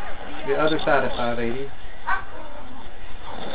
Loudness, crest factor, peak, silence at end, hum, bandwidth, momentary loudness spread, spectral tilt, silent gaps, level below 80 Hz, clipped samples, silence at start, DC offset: -25 LUFS; 18 dB; -6 dBFS; 0 s; none; 4 kHz; 19 LU; -8.5 dB/octave; none; -42 dBFS; under 0.1%; 0 s; 8%